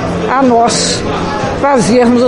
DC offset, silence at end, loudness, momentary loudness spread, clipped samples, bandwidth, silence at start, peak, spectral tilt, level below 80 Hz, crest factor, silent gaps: under 0.1%; 0 s; -11 LUFS; 7 LU; under 0.1%; 11.5 kHz; 0 s; 0 dBFS; -4.5 dB/octave; -34 dBFS; 10 dB; none